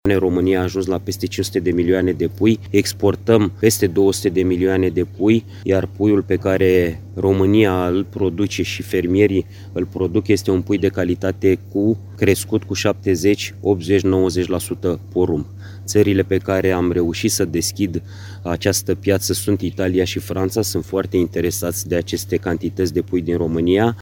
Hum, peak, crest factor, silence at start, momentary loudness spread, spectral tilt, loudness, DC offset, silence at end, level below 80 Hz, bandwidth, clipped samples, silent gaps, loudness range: none; 0 dBFS; 18 dB; 0.05 s; 6 LU; -5.5 dB/octave; -18 LUFS; under 0.1%; 0 s; -44 dBFS; 17 kHz; under 0.1%; none; 3 LU